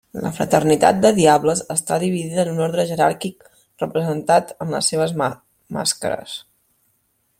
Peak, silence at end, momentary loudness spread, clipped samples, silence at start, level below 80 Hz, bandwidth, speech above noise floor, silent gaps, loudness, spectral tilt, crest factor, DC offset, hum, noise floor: -2 dBFS; 1 s; 14 LU; under 0.1%; 0.15 s; -56 dBFS; 16.5 kHz; 47 dB; none; -19 LUFS; -4.5 dB/octave; 18 dB; under 0.1%; none; -66 dBFS